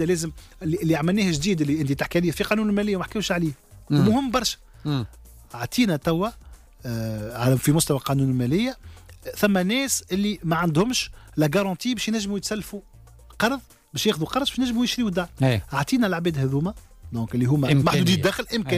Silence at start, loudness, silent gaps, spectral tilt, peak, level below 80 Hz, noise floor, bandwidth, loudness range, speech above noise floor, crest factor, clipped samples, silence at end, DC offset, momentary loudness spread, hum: 0 s; -23 LUFS; none; -5 dB/octave; -8 dBFS; -46 dBFS; -47 dBFS; 16 kHz; 3 LU; 25 dB; 14 dB; under 0.1%; 0 s; under 0.1%; 12 LU; none